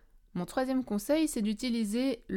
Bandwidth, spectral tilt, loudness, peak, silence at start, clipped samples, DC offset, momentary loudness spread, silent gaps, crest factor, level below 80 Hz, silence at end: 17 kHz; -5 dB/octave; -31 LUFS; -16 dBFS; 0.35 s; under 0.1%; under 0.1%; 7 LU; none; 14 dB; -56 dBFS; 0 s